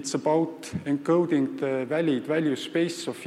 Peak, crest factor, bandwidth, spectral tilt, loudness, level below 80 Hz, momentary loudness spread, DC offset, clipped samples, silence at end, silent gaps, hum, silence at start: -12 dBFS; 14 dB; 13.5 kHz; -5.5 dB/octave; -26 LUFS; -68 dBFS; 6 LU; under 0.1%; under 0.1%; 0 s; none; none; 0 s